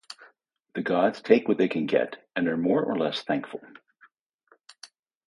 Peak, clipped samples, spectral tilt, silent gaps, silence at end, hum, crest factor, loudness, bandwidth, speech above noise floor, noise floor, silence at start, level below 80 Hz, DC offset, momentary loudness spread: -4 dBFS; under 0.1%; -6.5 dB/octave; 4.21-4.39 s; 0.4 s; none; 24 dB; -25 LUFS; 11.5 kHz; 39 dB; -65 dBFS; 0.1 s; -72 dBFS; under 0.1%; 18 LU